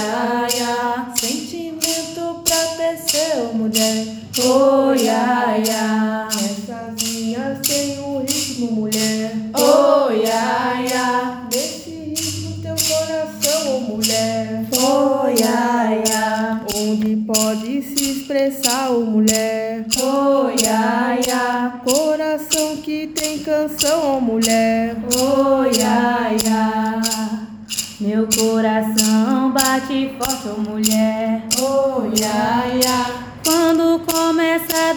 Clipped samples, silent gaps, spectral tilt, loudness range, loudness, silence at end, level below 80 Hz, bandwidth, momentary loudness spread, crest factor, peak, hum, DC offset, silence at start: under 0.1%; none; -3 dB/octave; 3 LU; -18 LUFS; 0 s; -52 dBFS; over 20 kHz; 7 LU; 18 dB; 0 dBFS; none; under 0.1%; 0 s